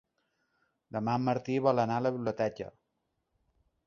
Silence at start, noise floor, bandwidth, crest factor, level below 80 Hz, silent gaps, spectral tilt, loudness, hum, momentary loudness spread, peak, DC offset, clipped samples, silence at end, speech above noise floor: 0.95 s; -81 dBFS; 7.2 kHz; 22 dB; -68 dBFS; none; -7.5 dB/octave; -31 LUFS; none; 13 LU; -12 dBFS; under 0.1%; under 0.1%; 1.15 s; 51 dB